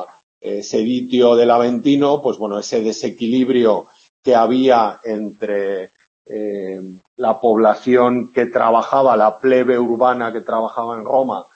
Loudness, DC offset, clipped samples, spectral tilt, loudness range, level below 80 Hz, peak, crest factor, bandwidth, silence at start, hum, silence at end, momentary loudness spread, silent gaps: -16 LUFS; under 0.1%; under 0.1%; -5.5 dB/octave; 4 LU; -66 dBFS; 0 dBFS; 16 dB; 7.6 kHz; 0 s; none; 0.15 s; 13 LU; 0.23-0.41 s, 4.09-4.23 s, 6.07-6.25 s, 7.07-7.17 s